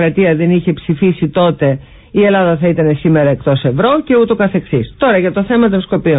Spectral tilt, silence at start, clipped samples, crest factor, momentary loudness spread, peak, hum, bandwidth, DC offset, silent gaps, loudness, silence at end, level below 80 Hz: -13 dB/octave; 0 s; under 0.1%; 10 dB; 5 LU; -2 dBFS; none; 4 kHz; under 0.1%; none; -12 LUFS; 0 s; -40 dBFS